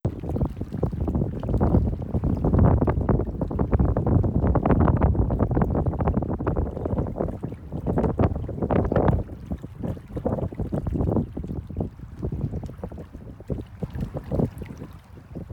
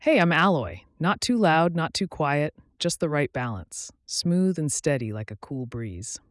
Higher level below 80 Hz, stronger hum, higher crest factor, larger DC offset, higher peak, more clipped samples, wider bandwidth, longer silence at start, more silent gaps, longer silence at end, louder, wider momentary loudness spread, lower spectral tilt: first, -30 dBFS vs -56 dBFS; neither; about the same, 16 dB vs 14 dB; neither; about the same, -8 dBFS vs -10 dBFS; neither; second, 4.7 kHz vs 12 kHz; about the same, 0.05 s vs 0 s; neither; second, 0 s vs 0.15 s; about the same, -25 LUFS vs -25 LUFS; about the same, 14 LU vs 15 LU; first, -11 dB/octave vs -5 dB/octave